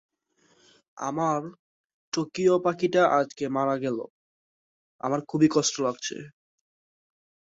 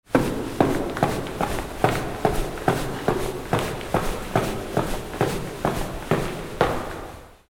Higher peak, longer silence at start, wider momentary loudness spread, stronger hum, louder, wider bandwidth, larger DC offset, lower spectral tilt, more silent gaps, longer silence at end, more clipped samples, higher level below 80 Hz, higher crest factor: second, -8 dBFS vs -2 dBFS; first, 0.95 s vs 0.1 s; first, 13 LU vs 6 LU; neither; about the same, -26 LUFS vs -25 LUFS; second, 8 kHz vs 18.5 kHz; neither; about the same, -4.5 dB/octave vs -5.5 dB/octave; first, 1.59-1.84 s, 1.93-2.12 s, 4.10-4.99 s vs none; first, 1.2 s vs 0.15 s; neither; second, -70 dBFS vs -36 dBFS; about the same, 18 dB vs 22 dB